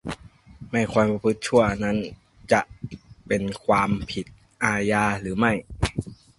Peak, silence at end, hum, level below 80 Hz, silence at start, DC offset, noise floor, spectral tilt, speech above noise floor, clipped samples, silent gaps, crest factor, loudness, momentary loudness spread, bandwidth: -4 dBFS; 0.25 s; none; -44 dBFS; 0.05 s; under 0.1%; -45 dBFS; -5.5 dB/octave; 23 dB; under 0.1%; none; 20 dB; -24 LUFS; 16 LU; 11.5 kHz